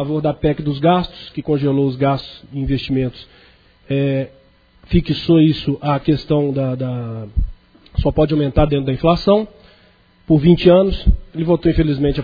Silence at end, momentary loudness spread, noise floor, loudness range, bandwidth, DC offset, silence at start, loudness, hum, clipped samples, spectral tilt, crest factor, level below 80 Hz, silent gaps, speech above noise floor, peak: 0 s; 12 LU; -52 dBFS; 5 LU; 5 kHz; under 0.1%; 0 s; -17 LUFS; none; under 0.1%; -9.5 dB/octave; 16 dB; -28 dBFS; none; 36 dB; 0 dBFS